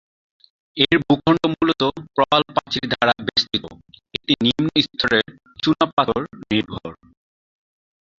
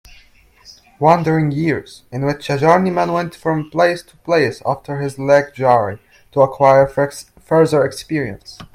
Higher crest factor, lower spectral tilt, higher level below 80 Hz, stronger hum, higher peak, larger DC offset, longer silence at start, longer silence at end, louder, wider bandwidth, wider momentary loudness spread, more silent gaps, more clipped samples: about the same, 20 dB vs 16 dB; about the same, -5.5 dB/octave vs -6.5 dB/octave; about the same, -52 dBFS vs -50 dBFS; neither; about the same, -2 dBFS vs 0 dBFS; neither; about the same, 0.75 s vs 0.7 s; first, 1.25 s vs 0.1 s; second, -19 LUFS vs -16 LUFS; second, 7.6 kHz vs 15 kHz; about the same, 13 LU vs 11 LU; first, 5.93-5.97 s vs none; neither